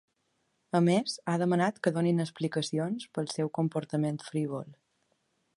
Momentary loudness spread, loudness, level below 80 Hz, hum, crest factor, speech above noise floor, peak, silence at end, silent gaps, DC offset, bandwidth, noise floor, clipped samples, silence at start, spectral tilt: 8 LU; -30 LUFS; -76 dBFS; none; 20 dB; 47 dB; -12 dBFS; 0.85 s; none; under 0.1%; 11.5 kHz; -76 dBFS; under 0.1%; 0.75 s; -6.5 dB/octave